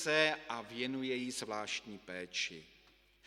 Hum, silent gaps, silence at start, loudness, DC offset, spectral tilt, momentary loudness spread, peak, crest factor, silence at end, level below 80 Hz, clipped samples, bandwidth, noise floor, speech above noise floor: none; none; 0 s; -38 LUFS; under 0.1%; -2.5 dB/octave; 13 LU; -14 dBFS; 24 dB; 0.6 s; -74 dBFS; under 0.1%; 16 kHz; -66 dBFS; 28 dB